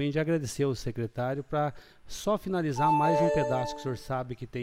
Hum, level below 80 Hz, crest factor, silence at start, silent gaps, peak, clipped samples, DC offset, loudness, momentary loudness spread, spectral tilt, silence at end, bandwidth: none; -52 dBFS; 16 dB; 0 s; none; -14 dBFS; under 0.1%; under 0.1%; -29 LUFS; 10 LU; -6.5 dB/octave; 0 s; 16 kHz